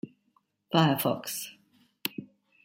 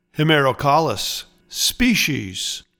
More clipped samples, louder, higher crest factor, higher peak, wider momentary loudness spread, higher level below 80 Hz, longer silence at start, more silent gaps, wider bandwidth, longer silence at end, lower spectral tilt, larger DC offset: neither; second, -29 LUFS vs -18 LUFS; first, 24 dB vs 16 dB; second, -8 dBFS vs -4 dBFS; first, 19 LU vs 9 LU; second, -74 dBFS vs -42 dBFS; about the same, 0.05 s vs 0.15 s; neither; second, 16.5 kHz vs 19 kHz; first, 0.4 s vs 0.2 s; first, -5 dB/octave vs -3.5 dB/octave; neither